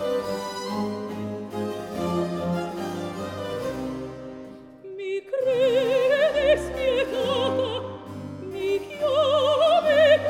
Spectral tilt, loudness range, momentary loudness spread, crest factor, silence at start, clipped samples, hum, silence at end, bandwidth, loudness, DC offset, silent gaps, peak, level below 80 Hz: -5 dB/octave; 7 LU; 16 LU; 16 dB; 0 s; under 0.1%; none; 0 s; 16 kHz; -24 LUFS; under 0.1%; none; -8 dBFS; -52 dBFS